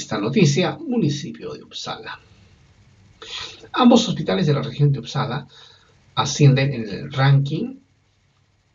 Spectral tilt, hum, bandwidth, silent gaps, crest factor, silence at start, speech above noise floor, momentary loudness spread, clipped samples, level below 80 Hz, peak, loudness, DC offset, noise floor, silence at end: -6 dB/octave; none; 7.6 kHz; none; 20 dB; 0 s; 42 dB; 17 LU; under 0.1%; -56 dBFS; -2 dBFS; -20 LUFS; under 0.1%; -61 dBFS; 1 s